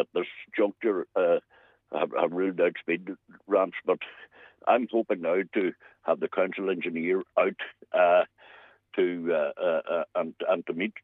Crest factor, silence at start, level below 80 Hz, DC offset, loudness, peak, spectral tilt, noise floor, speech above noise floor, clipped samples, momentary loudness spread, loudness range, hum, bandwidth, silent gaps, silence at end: 20 dB; 0 s; -84 dBFS; under 0.1%; -28 LUFS; -8 dBFS; -8 dB/octave; -54 dBFS; 27 dB; under 0.1%; 8 LU; 2 LU; none; 4 kHz; none; 0.05 s